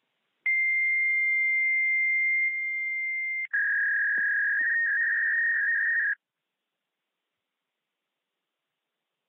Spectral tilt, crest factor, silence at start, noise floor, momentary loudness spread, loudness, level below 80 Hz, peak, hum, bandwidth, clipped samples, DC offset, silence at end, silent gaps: 2.5 dB/octave; 10 dB; 0.45 s; -86 dBFS; 5 LU; -24 LUFS; under -90 dBFS; -20 dBFS; none; 3.6 kHz; under 0.1%; under 0.1%; 3.15 s; none